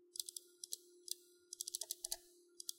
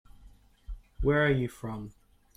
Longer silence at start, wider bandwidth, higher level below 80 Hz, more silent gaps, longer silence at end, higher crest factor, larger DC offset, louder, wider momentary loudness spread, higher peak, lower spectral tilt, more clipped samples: second, 0 s vs 0.2 s; about the same, 16.5 kHz vs 15 kHz; second, -82 dBFS vs -44 dBFS; neither; second, 0 s vs 0.45 s; first, 28 dB vs 18 dB; neither; second, -47 LUFS vs -29 LUFS; second, 8 LU vs 24 LU; second, -22 dBFS vs -14 dBFS; second, 2.5 dB/octave vs -7.5 dB/octave; neither